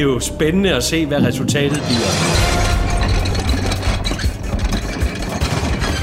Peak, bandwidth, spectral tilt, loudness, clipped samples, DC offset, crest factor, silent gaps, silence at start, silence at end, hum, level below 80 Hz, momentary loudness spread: -2 dBFS; 16 kHz; -4.5 dB/octave; -18 LUFS; under 0.1%; under 0.1%; 14 dB; none; 0 s; 0 s; none; -22 dBFS; 6 LU